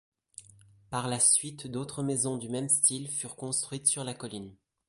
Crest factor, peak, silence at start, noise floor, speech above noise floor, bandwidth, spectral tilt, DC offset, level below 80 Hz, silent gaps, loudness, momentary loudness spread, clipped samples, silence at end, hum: 22 dB; -10 dBFS; 0.4 s; -58 dBFS; 27 dB; 12 kHz; -3 dB/octave; under 0.1%; -68 dBFS; none; -28 LUFS; 15 LU; under 0.1%; 0.35 s; none